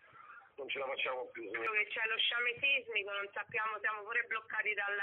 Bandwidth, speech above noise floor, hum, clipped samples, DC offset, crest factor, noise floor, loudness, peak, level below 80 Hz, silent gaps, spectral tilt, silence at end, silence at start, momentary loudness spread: 4 kHz; 20 dB; none; under 0.1%; under 0.1%; 16 dB; -57 dBFS; -35 LUFS; -20 dBFS; -86 dBFS; none; 2.5 dB/octave; 0 s; 0.15 s; 11 LU